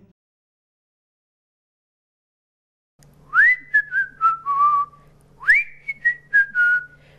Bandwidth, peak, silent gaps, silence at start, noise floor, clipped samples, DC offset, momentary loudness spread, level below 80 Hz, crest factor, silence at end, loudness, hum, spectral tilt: 12.5 kHz; -6 dBFS; none; 3.3 s; -51 dBFS; under 0.1%; under 0.1%; 9 LU; -60 dBFS; 16 dB; 0.35 s; -18 LUFS; none; -2 dB/octave